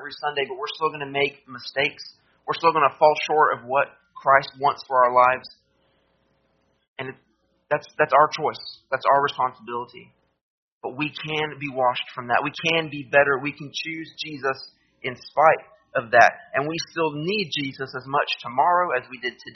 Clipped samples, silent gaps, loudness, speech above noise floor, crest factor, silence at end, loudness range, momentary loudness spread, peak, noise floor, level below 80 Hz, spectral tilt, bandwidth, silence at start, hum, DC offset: under 0.1%; 6.88-6.96 s, 10.41-10.81 s; -22 LUFS; 45 dB; 22 dB; 0.05 s; 5 LU; 15 LU; 0 dBFS; -67 dBFS; -68 dBFS; -1.5 dB/octave; 6.4 kHz; 0 s; none; under 0.1%